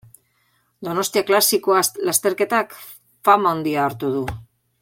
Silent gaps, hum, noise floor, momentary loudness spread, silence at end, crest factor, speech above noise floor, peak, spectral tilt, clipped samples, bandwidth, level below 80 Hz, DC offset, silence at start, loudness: none; none; -65 dBFS; 15 LU; 0.4 s; 18 dB; 46 dB; -2 dBFS; -3 dB/octave; under 0.1%; 17 kHz; -52 dBFS; under 0.1%; 0.8 s; -19 LUFS